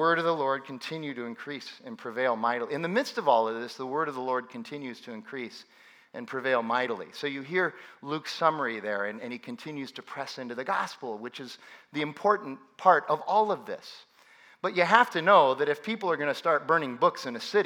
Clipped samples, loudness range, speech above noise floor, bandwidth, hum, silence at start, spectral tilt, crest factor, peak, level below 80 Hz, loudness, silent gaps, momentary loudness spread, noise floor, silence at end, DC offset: under 0.1%; 8 LU; 29 dB; 18.5 kHz; none; 0 s; -5 dB/octave; 26 dB; -2 dBFS; -90 dBFS; -28 LUFS; none; 17 LU; -57 dBFS; 0 s; under 0.1%